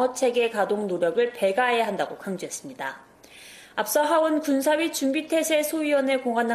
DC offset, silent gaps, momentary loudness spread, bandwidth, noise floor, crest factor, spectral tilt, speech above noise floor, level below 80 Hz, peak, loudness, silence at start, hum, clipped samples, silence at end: under 0.1%; none; 12 LU; 15.5 kHz; -48 dBFS; 16 dB; -3.5 dB/octave; 24 dB; -70 dBFS; -10 dBFS; -24 LUFS; 0 s; none; under 0.1%; 0 s